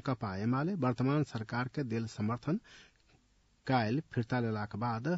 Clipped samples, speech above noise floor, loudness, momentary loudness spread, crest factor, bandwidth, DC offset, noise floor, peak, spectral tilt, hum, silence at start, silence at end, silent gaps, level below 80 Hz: under 0.1%; 36 dB; -35 LUFS; 5 LU; 16 dB; 7.6 kHz; under 0.1%; -69 dBFS; -18 dBFS; -6.5 dB/octave; none; 0.05 s; 0 s; none; -66 dBFS